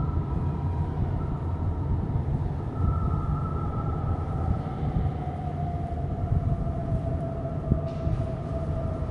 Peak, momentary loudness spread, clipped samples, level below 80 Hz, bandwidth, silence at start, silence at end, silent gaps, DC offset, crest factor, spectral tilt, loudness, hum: -8 dBFS; 3 LU; under 0.1%; -34 dBFS; 5.4 kHz; 0 s; 0 s; none; under 0.1%; 20 dB; -10.5 dB/octave; -29 LUFS; none